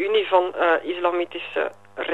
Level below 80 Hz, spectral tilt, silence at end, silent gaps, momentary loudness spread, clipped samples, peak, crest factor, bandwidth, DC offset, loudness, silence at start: -74 dBFS; -4.5 dB/octave; 0 s; none; 9 LU; under 0.1%; -4 dBFS; 18 dB; 8 kHz; 0.3%; -23 LUFS; 0 s